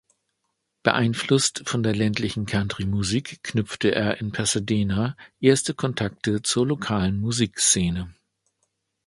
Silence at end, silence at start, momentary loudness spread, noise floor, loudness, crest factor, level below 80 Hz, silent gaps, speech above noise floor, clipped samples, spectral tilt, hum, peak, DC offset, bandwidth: 0.95 s; 0.85 s; 7 LU; -77 dBFS; -23 LUFS; 24 dB; -46 dBFS; none; 54 dB; under 0.1%; -4 dB/octave; none; 0 dBFS; under 0.1%; 11.5 kHz